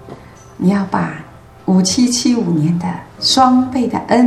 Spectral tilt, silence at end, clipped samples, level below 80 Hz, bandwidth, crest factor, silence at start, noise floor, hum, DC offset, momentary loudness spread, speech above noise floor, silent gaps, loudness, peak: -5 dB/octave; 0 s; under 0.1%; -48 dBFS; 13 kHz; 14 dB; 0 s; -36 dBFS; none; under 0.1%; 11 LU; 22 dB; none; -15 LUFS; 0 dBFS